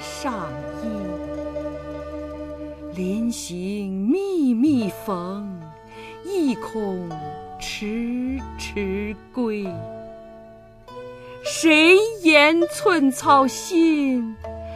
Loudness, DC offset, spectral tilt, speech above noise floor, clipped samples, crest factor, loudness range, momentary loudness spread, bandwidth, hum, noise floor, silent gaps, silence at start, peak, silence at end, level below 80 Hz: -21 LUFS; under 0.1%; -4.5 dB/octave; 24 dB; under 0.1%; 20 dB; 13 LU; 20 LU; 15.5 kHz; none; -45 dBFS; none; 0 s; -2 dBFS; 0 s; -46 dBFS